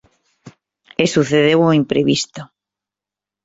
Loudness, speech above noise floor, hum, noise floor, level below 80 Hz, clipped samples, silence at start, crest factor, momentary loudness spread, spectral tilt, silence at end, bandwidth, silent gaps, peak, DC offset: -15 LUFS; 73 dB; none; -88 dBFS; -56 dBFS; under 0.1%; 1 s; 18 dB; 15 LU; -5 dB/octave; 1 s; 8 kHz; none; -2 dBFS; under 0.1%